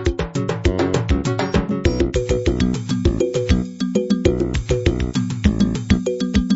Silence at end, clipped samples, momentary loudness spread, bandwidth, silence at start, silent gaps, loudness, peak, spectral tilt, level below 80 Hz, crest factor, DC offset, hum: 0 s; under 0.1%; 4 LU; 8 kHz; 0 s; none; -20 LUFS; 0 dBFS; -6.5 dB/octave; -26 dBFS; 18 dB; under 0.1%; none